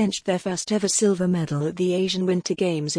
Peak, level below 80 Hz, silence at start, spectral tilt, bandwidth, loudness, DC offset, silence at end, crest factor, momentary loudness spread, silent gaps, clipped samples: -10 dBFS; -62 dBFS; 0 s; -4.5 dB/octave; 10.5 kHz; -23 LUFS; under 0.1%; 0 s; 14 dB; 5 LU; none; under 0.1%